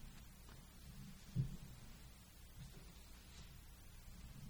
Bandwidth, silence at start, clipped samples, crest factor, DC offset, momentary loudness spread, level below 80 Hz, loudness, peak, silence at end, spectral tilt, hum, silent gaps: over 20 kHz; 0 s; under 0.1%; 24 dB; under 0.1%; 15 LU; -58 dBFS; -54 LUFS; -28 dBFS; 0 s; -5.5 dB/octave; none; none